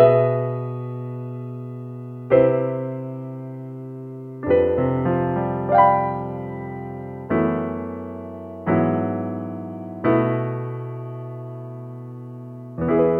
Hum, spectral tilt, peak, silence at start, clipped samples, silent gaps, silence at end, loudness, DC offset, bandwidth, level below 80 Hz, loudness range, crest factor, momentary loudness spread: none; -11 dB/octave; -2 dBFS; 0 s; under 0.1%; none; 0 s; -23 LUFS; under 0.1%; 4.3 kHz; -52 dBFS; 4 LU; 20 dB; 17 LU